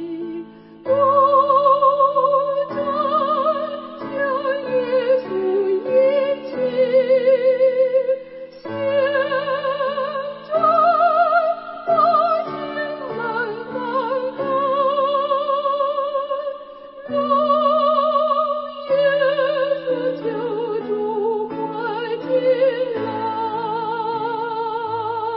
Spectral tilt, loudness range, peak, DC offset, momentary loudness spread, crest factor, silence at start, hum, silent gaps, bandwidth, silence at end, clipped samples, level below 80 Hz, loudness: -9.5 dB/octave; 4 LU; -4 dBFS; under 0.1%; 11 LU; 14 dB; 0 s; none; none; 5.8 kHz; 0 s; under 0.1%; -66 dBFS; -19 LUFS